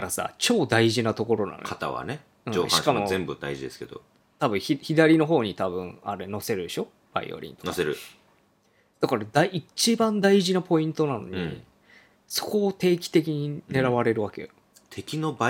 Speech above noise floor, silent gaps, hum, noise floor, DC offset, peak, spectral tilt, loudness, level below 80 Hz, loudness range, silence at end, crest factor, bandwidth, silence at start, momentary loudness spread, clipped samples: 40 dB; none; none; -65 dBFS; under 0.1%; -4 dBFS; -4.5 dB/octave; -25 LUFS; -64 dBFS; 5 LU; 0 s; 22 dB; 17.5 kHz; 0 s; 14 LU; under 0.1%